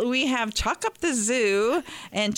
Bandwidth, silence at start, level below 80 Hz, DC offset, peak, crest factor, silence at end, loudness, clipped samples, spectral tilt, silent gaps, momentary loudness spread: 16.5 kHz; 0 s; -44 dBFS; under 0.1%; -14 dBFS; 12 dB; 0 s; -24 LUFS; under 0.1%; -2.5 dB/octave; none; 5 LU